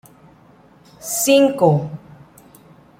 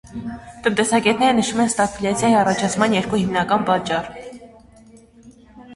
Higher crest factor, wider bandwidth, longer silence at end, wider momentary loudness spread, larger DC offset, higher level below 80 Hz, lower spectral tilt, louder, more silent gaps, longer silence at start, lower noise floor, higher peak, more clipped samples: about the same, 18 dB vs 18 dB; first, 16.5 kHz vs 11.5 kHz; first, 1.05 s vs 0 s; first, 20 LU vs 16 LU; neither; second, -60 dBFS vs -50 dBFS; about the same, -4.5 dB/octave vs -4 dB/octave; about the same, -16 LUFS vs -18 LUFS; neither; first, 1 s vs 0.05 s; about the same, -49 dBFS vs -47 dBFS; about the same, -2 dBFS vs -2 dBFS; neither